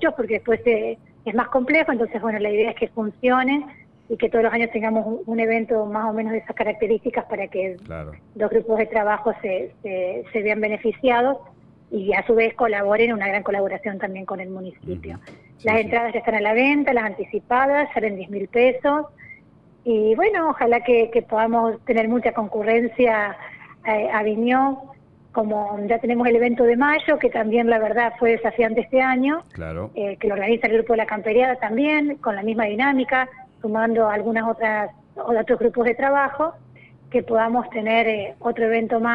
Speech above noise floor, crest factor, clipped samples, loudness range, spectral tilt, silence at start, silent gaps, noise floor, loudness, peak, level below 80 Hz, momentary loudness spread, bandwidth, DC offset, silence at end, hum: 31 dB; 14 dB; under 0.1%; 4 LU; -8 dB/octave; 0 s; none; -52 dBFS; -21 LUFS; -6 dBFS; -54 dBFS; 11 LU; 5.2 kHz; under 0.1%; 0 s; none